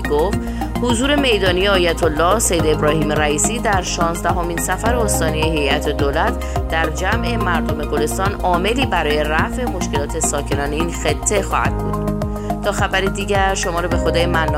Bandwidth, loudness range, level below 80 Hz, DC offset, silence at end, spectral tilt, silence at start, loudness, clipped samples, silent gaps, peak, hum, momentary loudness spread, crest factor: 16 kHz; 3 LU; -26 dBFS; under 0.1%; 0 s; -4 dB/octave; 0 s; -18 LUFS; under 0.1%; none; -2 dBFS; none; 6 LU; 16 dB